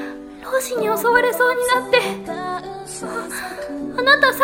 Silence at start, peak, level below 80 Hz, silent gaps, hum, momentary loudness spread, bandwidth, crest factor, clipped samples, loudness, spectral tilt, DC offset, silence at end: 0 s; 0 dBFS; -54 dBFS; none; none; 14 LU; 16.5 kHz; 18 dB; under 0.1%; -19 LUFS; -2.5 dB/octave; under 0.1%; 0 s